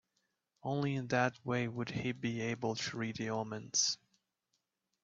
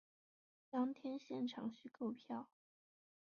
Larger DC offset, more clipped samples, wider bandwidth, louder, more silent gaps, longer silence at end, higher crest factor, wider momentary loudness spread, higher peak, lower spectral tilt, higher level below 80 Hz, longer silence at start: neither; neither; first, 7.8 kHz vs 6.8 kHz; first, -36 LUFS vs -46 LUFS; neither; first, 1.1 s vs 0.8 s; first, 22 dB vs 16 dB; about the same, 7 LU vs 8 LU; first, -16 dBFS vs -30 dBFS; second, -3.5 dB/octave vs -5 dB/octave; first, -74 dBFS vs under -90 dBFS; about the same, 0.65 s vs 0.75 s